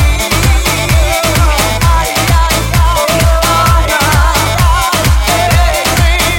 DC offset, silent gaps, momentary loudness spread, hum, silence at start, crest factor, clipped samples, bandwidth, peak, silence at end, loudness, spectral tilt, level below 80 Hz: under 0.1%; none; 2 LU; none; 0 s; 10 dB; under 0.1%; 17 kHz; 0 dBFS; 0 s; -10 LUFS; -4 dB/octave; -14 dBFS